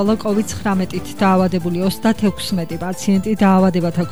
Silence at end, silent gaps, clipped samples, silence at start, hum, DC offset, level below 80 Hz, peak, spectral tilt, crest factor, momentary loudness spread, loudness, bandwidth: 0 s; none; under 0.1%; 0 s; none; 2%; -42 dBFS; -4 dBFS; -6.5 dB/octave; 12 dB; 8 LU; -17 LUFS; over 20 kHz